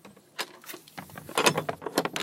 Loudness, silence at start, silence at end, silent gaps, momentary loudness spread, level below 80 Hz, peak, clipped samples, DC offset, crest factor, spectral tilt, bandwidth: -29 LUFS; 0.05 s; 0 s; none; 19 LU; -70 dBFS; -4 dBFS; under 0.1%; under 0.1%; 28 dB; -2.5 dB/octave; 16.5 kHz